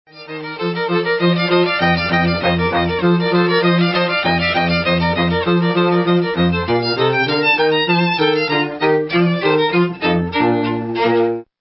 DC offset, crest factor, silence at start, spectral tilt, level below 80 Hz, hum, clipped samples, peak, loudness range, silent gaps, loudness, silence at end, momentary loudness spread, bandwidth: under 0.1%; 12 dB; 0.15 s; -10.5 dB/octave; -40 dBFS; none; under 0.1%; -2 dBFS; 1 LU; none; -16 LUFS; 0.15 s; 4 LU; 5.8 kHz